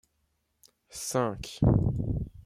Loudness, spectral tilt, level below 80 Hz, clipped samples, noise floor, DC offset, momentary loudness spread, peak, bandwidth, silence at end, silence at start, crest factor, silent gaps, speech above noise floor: -29 LUFS; -6.5 dB/octave; -42 dBFS; under 0.1%; -75 dBFS; under 0.1%; 11 LU; -10 dBFS; 15.5 kHz; 0.05 s; 0.95 s; 20 dB; none; 49 dB